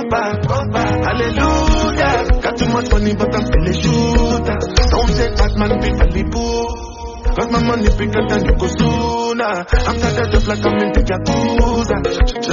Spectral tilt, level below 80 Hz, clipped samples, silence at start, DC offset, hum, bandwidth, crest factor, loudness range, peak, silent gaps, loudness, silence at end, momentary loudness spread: -5 dB/octave; -18 dBFS; under 0.1%; 0 s; under 0.1%; none; 7.4 kHz; 14 dB; 2 LU; 0 dBFS; none; -16 LUFS; 0 s; 3 LU